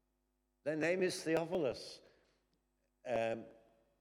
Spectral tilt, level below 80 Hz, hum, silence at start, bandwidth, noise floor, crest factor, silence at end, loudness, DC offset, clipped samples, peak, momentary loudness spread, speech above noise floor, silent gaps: -5 dB/octave; -74 dBFS; none; 0.65 s; 16 kHz; -82 dBFS; 18 dB; 0.5 s; -38 LUFS; under 0.1%; under 0.1%; -22 dBFS; 17 LU; 45 dB; none